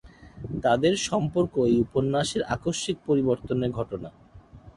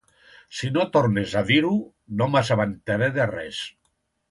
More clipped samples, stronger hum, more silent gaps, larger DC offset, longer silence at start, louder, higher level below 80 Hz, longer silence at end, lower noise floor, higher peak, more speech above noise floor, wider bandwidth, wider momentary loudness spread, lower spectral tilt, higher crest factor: neither; neither; neither; neither; second, 0.05 s vs 0.5 s; second, -26 LUFS vs -23 LUFS; about the same, -50 dBFS vs -54 dBFS; second, 0.05 s vs 0.6 s; second, -49 dBFS vs -72 dBFS; second, -10 dBFS vs -6 dBFS; second, 24 dB vs 49 dB; about the same, 11.5 kHz vs 11.5 kHz; about the same, 12 LU vs 12 LU; about the same, -5.5 dB/octave vs -6 dB/octave; about the same, 16 dB vs 18 dB